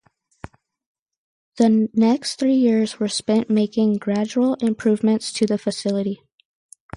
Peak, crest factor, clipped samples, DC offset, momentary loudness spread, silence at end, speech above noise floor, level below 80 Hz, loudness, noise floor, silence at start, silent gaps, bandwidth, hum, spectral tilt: -6 dBFS; 14 dB; under 0.1%; under 0.1%; 6 LU; 0.8 s; 24 dB; -60 dBFS; -20 LUFS; -43 dBFS; 1.55 s; none; 11.5 kHz; none; -5.5 dB/octave